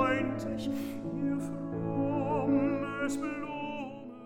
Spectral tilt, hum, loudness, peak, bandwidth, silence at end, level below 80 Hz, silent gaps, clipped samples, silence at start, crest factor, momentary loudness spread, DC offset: -6.5 dB/octave; none; -33 LUFS; -16 dBFS; 16.5 kHz; 0 s; -58 dBFS; none; under 0.1%; 0 s; 16 dB; 9 LU; under 0.1%